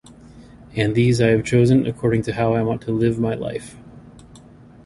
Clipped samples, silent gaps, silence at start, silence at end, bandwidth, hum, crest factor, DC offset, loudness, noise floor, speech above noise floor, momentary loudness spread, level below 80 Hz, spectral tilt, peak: under 0.1%; none; 0.35 s; 0.5 s; 11.5 kHz; none; 16 dB; under 0.1%; -19 LUFS; -45 dBFS; 26 dB; 13 LU; -46 dBFS; -7 dB/octave; -4 dBFS